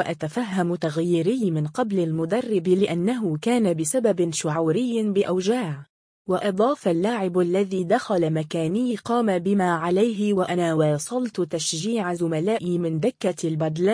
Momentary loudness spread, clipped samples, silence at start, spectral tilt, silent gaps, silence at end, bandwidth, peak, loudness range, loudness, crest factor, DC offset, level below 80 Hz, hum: 4 LU; under 0.1%; 0 s; -6 dB/octave; 5.89-6.25 s; 0 s; 10.5 kHz; -8 dBFS; 1 LU; -23 LUFS; 14 dB; under 0.1%; -66 dBFS; none